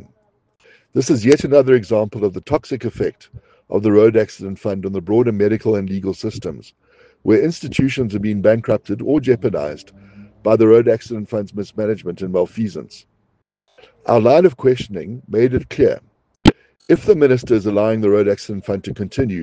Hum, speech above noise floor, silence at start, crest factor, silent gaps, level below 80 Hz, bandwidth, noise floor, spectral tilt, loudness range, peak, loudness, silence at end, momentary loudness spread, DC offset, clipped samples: none; 50 dB; 0.95 s; 18 dB; none; -42 dBFS; 9.2 kHz; -66 dBFS; -7 dB/octave; 3 LU; 0 dBFS; -17 LUFS; 0 s; 13 LU; under 0.1%; under 0.1%